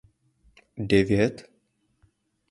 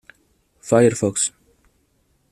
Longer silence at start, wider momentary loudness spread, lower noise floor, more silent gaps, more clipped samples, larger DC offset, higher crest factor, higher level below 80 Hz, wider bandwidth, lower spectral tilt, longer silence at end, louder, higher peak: about the same, 0.75 s vs 0.65 s; first, 24 LU vs 9 LU; first, -70 dBFS vs -64 dBFS; neither; neither; neither; about the same, 22 dB vs 20 dB; first, -50 dBFS vs -58 dBFS; second, 11.5 kHz vs 13.5 kHz; first, -7 dB/octave vs -4.5 dB/octave; about the same, 1.1 s vs 1 s; second, -24 LUFS vs -19 LUFS; second, -6 dBFS vs -2 dBFS